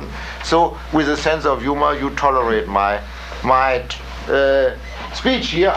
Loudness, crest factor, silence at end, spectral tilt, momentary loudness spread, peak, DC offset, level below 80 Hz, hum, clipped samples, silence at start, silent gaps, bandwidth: -18 LUFS; 16 dB; 0 s; -5 dB/octave; 12 LU; -2 dBFS; under 0.1%; -32 dBFS; none; under 0.1%; 0 s; none; 15 kHz